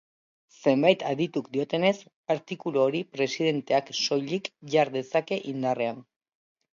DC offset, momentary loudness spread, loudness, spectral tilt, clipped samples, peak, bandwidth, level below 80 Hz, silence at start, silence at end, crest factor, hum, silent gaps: under 0.1%; 8 LU; -27 LUFS; -5 dB/octave; under 0.1%; -6 dBFS; 7.4 kHz; -76 dBFS; 0.6 s; 0.75 s; 22 dB; none; 2.16-2.24 s